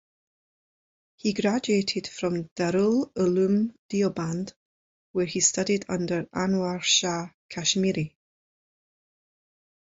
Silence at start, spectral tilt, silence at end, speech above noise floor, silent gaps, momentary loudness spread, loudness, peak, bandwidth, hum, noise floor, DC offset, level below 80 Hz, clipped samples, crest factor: 1.25 s; -4 dB/octave; 1.9 s; over 65 dB; 2.51-2.56 s, 3.78-3.89 s, 4.56-5.14 s, 7.34-7.49 s; 9 LU; -26 LUFS; -8 dBFS; 8 kHz; none; under -90 dBFS; under 0.1%; -62 dBFS; under 0.1%; 20 dB